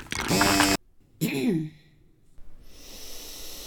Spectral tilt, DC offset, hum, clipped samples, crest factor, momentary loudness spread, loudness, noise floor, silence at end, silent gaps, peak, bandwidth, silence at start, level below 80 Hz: -3.5 dB/octave; under 0.1%; none; under 0.1%; 24 dB; 20 LU; -24 LUFS; -57 dBFS; 0 s; none; -4 dBFS; over 20 kHz; 0 s; -46 dBFS